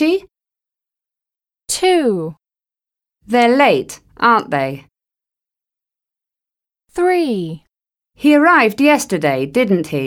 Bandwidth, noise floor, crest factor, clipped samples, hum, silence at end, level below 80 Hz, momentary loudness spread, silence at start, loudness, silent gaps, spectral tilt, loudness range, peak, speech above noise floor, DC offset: 18 kHz; under -90 dBFS; 16 dB; under 0.1%; none; 0 s; -56 dBFS; 15 LU; 0 s; -15 LUFS; none; -4.5 dB/octave; 7 LU; -2 dBFS; over 76 dB; under 0.1%